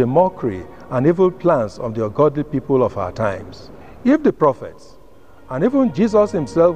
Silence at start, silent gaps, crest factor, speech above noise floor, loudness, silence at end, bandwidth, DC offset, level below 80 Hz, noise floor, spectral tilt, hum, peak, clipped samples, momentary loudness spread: 0 s; none; 16 dB; 30 dB; -18 LUFS; 0 s; 9.4 kHz; 0.7%; -48 dBFS; -47 dBFS; -8.5 dB/octave; none; -2 dBFS; under 0.1%; 11 LU